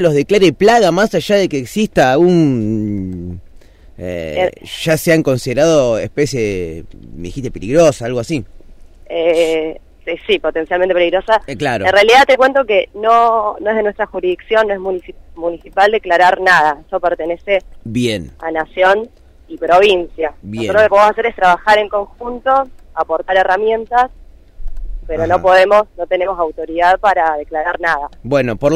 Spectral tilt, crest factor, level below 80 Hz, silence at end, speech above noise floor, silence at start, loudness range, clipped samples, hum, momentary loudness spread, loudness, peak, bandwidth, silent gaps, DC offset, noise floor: -5 dB/octave; 14 dB; -36 dBFS; 0 s; 26 dB; 0 s; 5 LU; under 0.1%; none; 14 LU; -14 LUFS; 0 dBFS; 15.5 kHz; none; under 0.1%; -39 dBFS